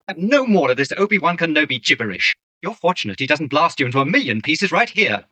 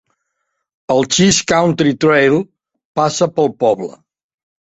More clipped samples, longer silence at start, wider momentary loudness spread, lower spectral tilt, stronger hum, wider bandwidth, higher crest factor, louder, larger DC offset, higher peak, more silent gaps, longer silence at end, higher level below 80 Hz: neither; second, 0.1 s vs 0.9 s; second, 5 LU vs 10 LU; about the same, -4.5 dB/octave vs -4 dB/octave; neither; first, 9.2 kHz vs 8.2 kHz; about the same, 18 dB vs 16 dB; second, -17 LUFS vs -14 LUFS; neither; about the same, -2 dBFS vs 0 dBFS; first, 2.43-2.61 s vs 2.85-2.95 s; second, 0.15 s vs 0.85 s; second, -66 dBFS vs -50 dBFS